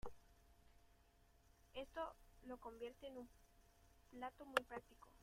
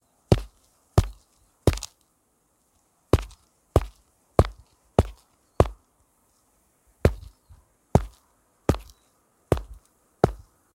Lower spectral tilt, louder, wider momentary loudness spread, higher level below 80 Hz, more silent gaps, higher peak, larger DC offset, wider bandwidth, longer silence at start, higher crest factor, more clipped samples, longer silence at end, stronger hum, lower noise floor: second, -3.5 dB/octave vs -7 dB/octave; second, -51 LUFS vs -26 LUFS; about the same, 19 LU vs 17 LU; second, -70 dBFS vs -34 dBFS; neither; second, -22 dBFS vs 0 dBFS; neither; about the same, 16 kHz vs 16.5 kHz; second, 0.05 s vs 0.3 s; about the same, 32 dB vs 28 dB; neither; second, 0 s vs 0.45 s; neither; first, -73 dBFS vs -68 dBFS